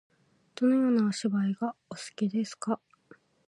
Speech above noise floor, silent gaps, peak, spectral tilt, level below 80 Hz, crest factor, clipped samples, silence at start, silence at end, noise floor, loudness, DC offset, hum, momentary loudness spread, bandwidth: 31 dB; none; -16 dBFS; -6 dB/octave; -80 dBFS; 14 dB; under 0.1%; 0.6 s; 0.75 s; -60 dBFS; -29 LUFS; under 0.1%; none; 14 LU; 11.5 kHz